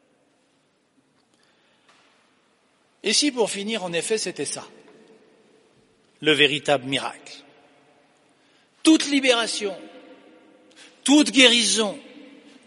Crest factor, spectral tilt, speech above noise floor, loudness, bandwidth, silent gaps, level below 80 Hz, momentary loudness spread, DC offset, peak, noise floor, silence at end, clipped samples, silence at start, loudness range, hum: 24 dB; -2 dB/octave; 44 dB; -20 LUFS; 11.5 kHz; none; -76 dBFS; 18 LU; under 0.1%; 0 dBFS; -65 dBFS; 0.45 s; under 0.1%; 3.05 s; 7 LU; none